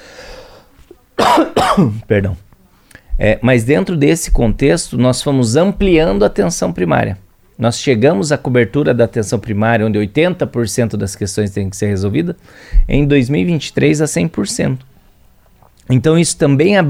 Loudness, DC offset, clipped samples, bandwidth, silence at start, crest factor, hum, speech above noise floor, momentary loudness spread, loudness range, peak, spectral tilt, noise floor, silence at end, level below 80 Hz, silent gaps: -14 LUFS; under 0.1%; under 0.1%; 16.5 kHz; 0.15 s; 14 dB; none; 35 dB; 8 LU; 3 LU; 0 dBFS; -5.5 dB/octave; -48 dBFS; 0 s; -26 dBFS; none